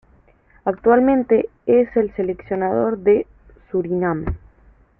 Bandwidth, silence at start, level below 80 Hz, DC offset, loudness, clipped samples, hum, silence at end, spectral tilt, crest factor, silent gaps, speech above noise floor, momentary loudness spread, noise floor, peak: 3.3 kHz; 0.65 s; -42 dBFS; under 0.1%; -19 LUFS; under 0.1%; none; 0.6 s; -12 dB/octave; 18 dB; none; 36 dB; 11 LU; -54 dBFS; -2 dBFS